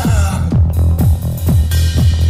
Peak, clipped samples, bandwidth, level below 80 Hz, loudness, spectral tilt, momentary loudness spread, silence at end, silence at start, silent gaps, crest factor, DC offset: -2 dBFS; under 0.1%; 16 kHz; -16 dBFS; -14 LUFS; -6.5 dB/octave; 2 LU; 0 s; 0 s; none; 10 dB; under 0.1%